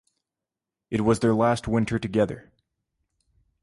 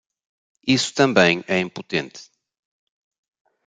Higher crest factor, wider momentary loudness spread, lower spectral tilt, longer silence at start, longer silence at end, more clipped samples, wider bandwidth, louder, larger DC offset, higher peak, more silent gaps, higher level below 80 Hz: about the same, 18 dB vs 22 dB; second, 8 LU vs 12 LU; first, -7 dB/octave vs -4 dB/octave; first, 0.9 s vs 0.65 s; second, 1.25 s vs 1.45 s; neither; first, 11.5 kHz vs 9.4 kHz; second, -24 LUFS vs -20 LUFS; neither; second, -8 dBFS vs -2 dBFS; neither; first, -50 dBFS vs -62 dBFS